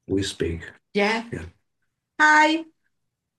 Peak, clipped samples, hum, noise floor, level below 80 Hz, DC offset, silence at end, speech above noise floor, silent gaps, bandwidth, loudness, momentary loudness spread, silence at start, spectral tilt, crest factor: -6 dBFS; under 0.1%; none; -78 dBFS; -54 dBFS; under 0.1%; 0.75 s; 57 dB; none; 12.5 kHz; -21 LUFS; 20 LU; 0.1 s; -4 dB/octave; 18 dB